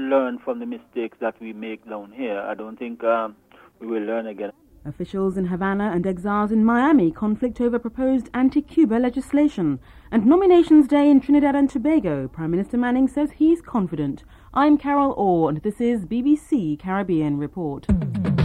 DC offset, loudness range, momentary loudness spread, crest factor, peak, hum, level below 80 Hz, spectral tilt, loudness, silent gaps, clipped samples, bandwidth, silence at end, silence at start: under 0.1%; 10 LU; 15 LU; 16 dB; -6 dBFS; none; -44 dBFS; -8.5 dB/octave; -21 LUFS; none; under 0.1%; 10 kHz; 0 s; 0 s